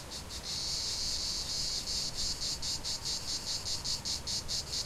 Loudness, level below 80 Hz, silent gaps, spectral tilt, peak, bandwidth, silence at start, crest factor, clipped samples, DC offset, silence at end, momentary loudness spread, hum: -33 LUFS; -50 dBFS; none; -1 dB/octave; -22 dBFS; 16.5 kHz; 0 s; 14 dB; under 0.1%; under 0.1%; 0 s; 2 LU; none